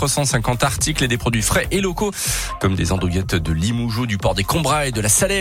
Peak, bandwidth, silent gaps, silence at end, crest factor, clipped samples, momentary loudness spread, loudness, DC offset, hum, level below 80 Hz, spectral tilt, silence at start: -2 dBFS; 17 kHz; none; 0 s; 16 dB; under 0.1%; 4 LU; -19 LUFS; under 0.1%; none; -32 dBFS; -4 dB/octave; 0 s